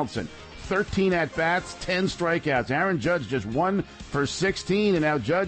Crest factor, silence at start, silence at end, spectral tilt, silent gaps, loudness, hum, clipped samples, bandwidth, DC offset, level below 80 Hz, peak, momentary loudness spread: 12 dB; 0 s; 0 s; -5.5 dB/octave; none; -25 LUFS; none; under 0.1%; 8.8 kHz; under 0.1%; -48 dBFS; -12 dBFS; 7 LU